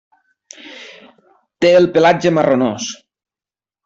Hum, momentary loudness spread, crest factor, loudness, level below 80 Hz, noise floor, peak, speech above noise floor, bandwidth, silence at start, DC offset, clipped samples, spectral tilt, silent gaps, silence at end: none; 24 LU; 14 dB; -14 LUFS; -56 dBFS; under -90 dBFS; -2 dBFS; over 77 dB; 7.8 kHz; 0.65 s; under 0.1%; under 0.1%; -5 dB/octave; none; 0.9 s